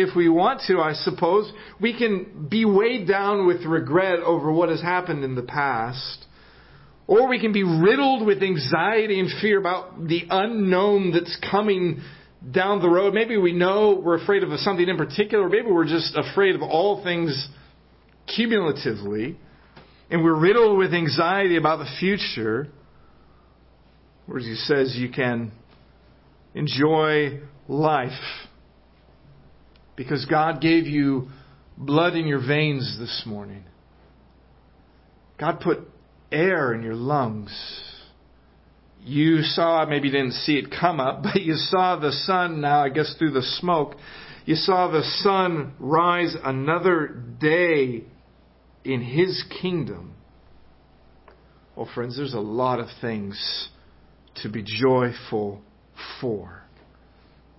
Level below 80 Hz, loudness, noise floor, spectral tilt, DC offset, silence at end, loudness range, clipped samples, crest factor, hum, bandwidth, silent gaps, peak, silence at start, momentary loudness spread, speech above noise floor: -58 dBFS; -22 LUFS; -55 dBFS; -9.5 dB/octave; under 0.1%; 1 s; 8 LU; under 0.1%; 20 dB; none; 5.8 kHz; none; -4 dBFS; 0 s; 14 LU; 33 dB